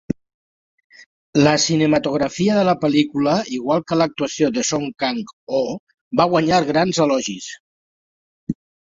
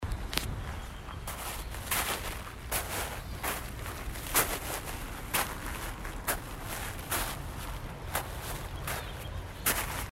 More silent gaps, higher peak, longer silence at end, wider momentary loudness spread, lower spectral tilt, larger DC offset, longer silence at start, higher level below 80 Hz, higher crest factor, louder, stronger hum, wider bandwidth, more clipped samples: first, 0.34-0.78 s, 0.84-0.90 s, 1.06-1.33 s, 5.33-5.47 s, 5.79-5.87 s, 6.01-6.11 s, 7.60-8.47 s vs none; first, -2 dBFS vs -6 dBFS; first, 0.4 s vs 0.05 s; first, 15 LU vs 10 LU; first, -4.5 dB/octave vs -2.5 dB/octave; neither; about the same, 0.1 s vs 0 s; second, -56 dBFS vs -42 dBFS; second, 18 dB vs 30 dB; first, -19 LUFS vs -35 LUFS; neither; second, 7.8 kHz vs 16 kHz; neither